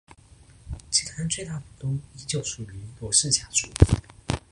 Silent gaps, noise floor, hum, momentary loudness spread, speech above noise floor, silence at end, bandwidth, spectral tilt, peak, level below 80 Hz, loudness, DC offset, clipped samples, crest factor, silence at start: none; -52 dBFS; none; 16 LU; 27 dB; 0.1 s; 11.5 kHz; -3.5 dB/octave; -2 dBFS; -36 dBFS; -25 LUFS; under 0.1%; under 0.1%; 24 dB; 0.65 s